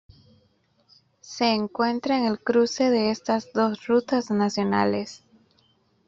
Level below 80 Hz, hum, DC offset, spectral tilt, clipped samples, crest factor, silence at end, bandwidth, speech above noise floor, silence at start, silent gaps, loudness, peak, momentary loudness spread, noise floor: -66 dBFS; none; under 0.1%; -5 dB/octave; under 0.1%; 18 dB; 0.9 s; 7.6 kHz; 42 dB; 1.25 s; none; -24 LUFS; -6 dBFS; 4 LU; -65 dBFS